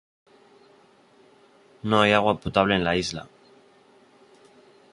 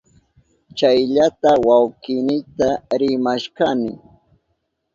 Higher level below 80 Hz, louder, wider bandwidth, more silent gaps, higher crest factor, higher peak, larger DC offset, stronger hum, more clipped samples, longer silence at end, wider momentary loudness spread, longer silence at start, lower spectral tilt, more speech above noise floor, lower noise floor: about the same, -52 dBFS vs -54 dBFS; second, -22 LUFS vs -18 LUFS; first, 11.5 kHz vs 7.6 kHz; neither; first, 24 dB vs 16 dB; about the same, -4 dBFS vs -2 dBFS; neither; neither; neither; first, 1.7 s vs 1 s; first, 14 LU vs 8 LU; first, 1.85 s vs 0.75 s; about the same, -5 dB/octave vs -5.5 dB/octave; second, 35 dB vs 54 dB; second, -57 dBFS vs -71 dBFS